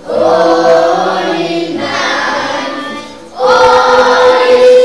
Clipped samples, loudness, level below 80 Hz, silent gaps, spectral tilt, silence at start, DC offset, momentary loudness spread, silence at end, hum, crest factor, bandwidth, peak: 1%; -9 LUFS; -46 dBFS; none; -3.5 dB/octave; 0 s; 0.8%; 12 LU; 0 s; none; 8 dB; 11 kHz; 0 dBFS